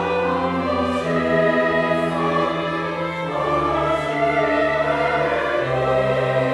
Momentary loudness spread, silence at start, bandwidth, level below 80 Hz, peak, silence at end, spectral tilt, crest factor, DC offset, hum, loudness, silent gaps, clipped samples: 5 LU; 0 s; 12 kHz; -44 dBFS; -6 dBFS; 0 s; -6.5 dB/octave; 14 dB; under 0.1%; none; -20 LUFS; none; under 0.1%